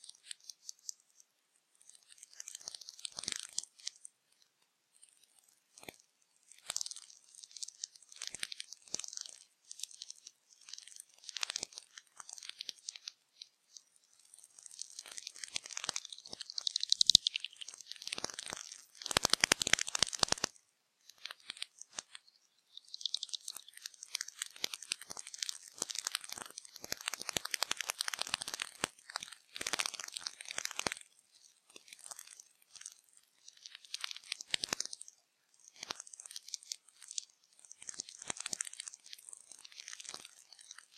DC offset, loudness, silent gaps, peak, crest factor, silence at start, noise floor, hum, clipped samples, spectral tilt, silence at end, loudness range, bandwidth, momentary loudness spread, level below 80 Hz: under 0.1%; -38 LUFS; none; -4 dBFS; 38 dB; 0.05 s; -77 dBFS; none; under 0.1%; 0.5 dB/octave; 0.2 s; 14 LU; 16 kHz; 21 LU; -72 dBFS